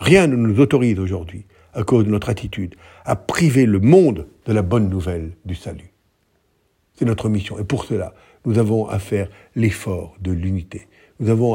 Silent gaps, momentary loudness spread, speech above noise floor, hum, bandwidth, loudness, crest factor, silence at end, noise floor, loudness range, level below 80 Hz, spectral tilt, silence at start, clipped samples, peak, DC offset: none; 17 LU; 46 dB; none; 16.5 kHz; -19 LUFS; 18 dB; 0 s; -64 dBFS; 7 LU; -44 dBFS; -7 dB/octave; 0 s; under 0.1%; 0 dBFS; under 0.1%